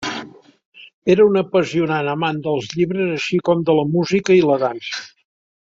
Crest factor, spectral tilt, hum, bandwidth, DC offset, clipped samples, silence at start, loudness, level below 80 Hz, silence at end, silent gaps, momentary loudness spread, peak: 16 dB; -6 dB/octave; none; 7.6 kHz; under 0.1%; under 0.1%; 0 s; -18 LUFS; -58 dBFS; 0.7 s; 0.65-0.72 s, 0.94-1.02 s; 12 LU; -2 dBFS